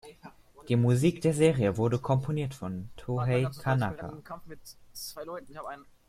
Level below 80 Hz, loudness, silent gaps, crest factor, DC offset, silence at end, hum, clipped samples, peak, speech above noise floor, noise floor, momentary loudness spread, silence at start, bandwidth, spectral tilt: -56 dBFS; -28 LUFS; none; 20 dB; under 0.1%; 0.25 s; none; under 0.1%; -10 dBFS; 23 dB; -52 dBFS; 19 LU; 0.05 s; 15.5 kHz; -7 dB/octave